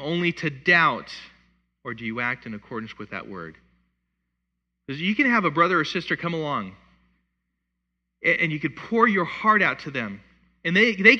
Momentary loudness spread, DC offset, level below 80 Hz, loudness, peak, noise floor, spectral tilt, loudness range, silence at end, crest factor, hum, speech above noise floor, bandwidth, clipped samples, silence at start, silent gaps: 18 LU; under 0.1%; -62 dBFS; -22 LUFS; -2 dBFS; -79 dBFS; -6 dB/octave; 10 LU; 0 s; 24 dB; none; 56 dB; 8.6 kHz; under 0.1%; 0 s; none